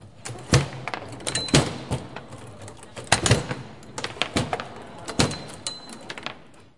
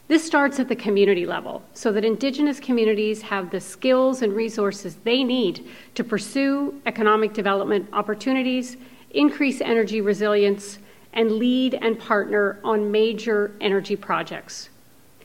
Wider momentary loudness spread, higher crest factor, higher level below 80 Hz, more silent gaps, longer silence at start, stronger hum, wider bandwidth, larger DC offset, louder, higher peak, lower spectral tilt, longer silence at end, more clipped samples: first, 19 LU vs 9 LU; first, 28 dB vs 18 dB; first, -44 dBFS vs -68 dBFS; neither; about the same, 0 s vs 0.1 s; neither; second, 11.5 kHz vs 16 kHz; about the same, 0.4% vs 0.2%; second, -25 LUFS vs -22 LUFS; first, 0 dBFS vs -4 dBFS; about the same, -4 dB/octave vs -5 dB/octave; second, 0.15 s vs 0.6 s; neither